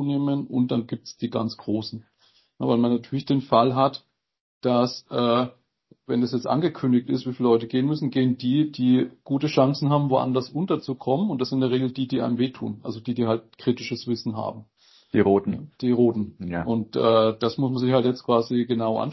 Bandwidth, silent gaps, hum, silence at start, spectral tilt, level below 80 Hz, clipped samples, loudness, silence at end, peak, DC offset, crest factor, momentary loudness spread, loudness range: 6 kHz; 4.41-4.61 s; none; 0 s; -8 dB/octave; -60 dBFS; under 0.1%; -24 LUFS; 0 s; -6 dBFS; under 0.1%; 18 dB; 9 LU; 4 LU